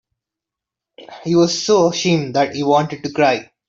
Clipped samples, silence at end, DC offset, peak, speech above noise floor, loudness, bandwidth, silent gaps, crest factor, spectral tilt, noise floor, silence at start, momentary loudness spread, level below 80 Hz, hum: under 0.1%; 0.25 s; under 0.1%; -2 dBFS; 69 dB; -16 LUFS; 7.8 kHz; none; 16 dB; -5 dB/octave; -85 dBFS; 1 s; 4 LU; -58 dBFS; none